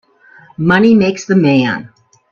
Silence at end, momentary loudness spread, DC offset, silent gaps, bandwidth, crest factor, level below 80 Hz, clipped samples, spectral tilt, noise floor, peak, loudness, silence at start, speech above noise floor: 0.45 s; 9 LU; under 0.1%; none; 7.2 kHz; 14 dB; -50 dBFS; under 0.1%; -6.5 dB/octave; -44 dBFS; 0 dBFS; -12 LUFS; 0.6 s; 33 dB